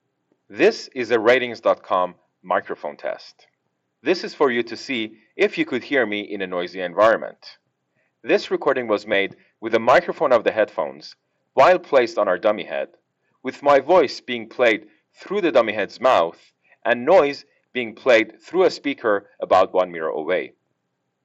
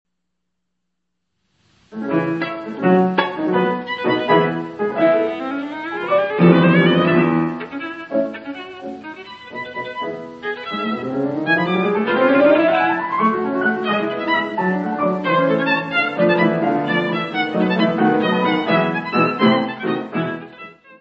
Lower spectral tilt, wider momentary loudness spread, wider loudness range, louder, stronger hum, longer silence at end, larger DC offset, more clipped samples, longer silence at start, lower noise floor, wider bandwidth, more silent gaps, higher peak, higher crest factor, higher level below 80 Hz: second, -5 dB/octave vs -8.5 dB/octave; about the same, 13 LU vs 14 LU; about the same, 4 LU vs 6 LU; about the same, -20 LUFS vs -18 LUFS; neither; first, 0.75 s vs 0.05 s; neither; neither; second, 0.5 s vs 1.95 s; about the same, -75 dBFS vs -78 dBFS; first, 8 kHz vs 6 kHz; neither; second, -6 dBFS vs 0 dBFS; about the same, 14 dB vs 18 dB; about the same, -64 dBFS vs -62 dBFS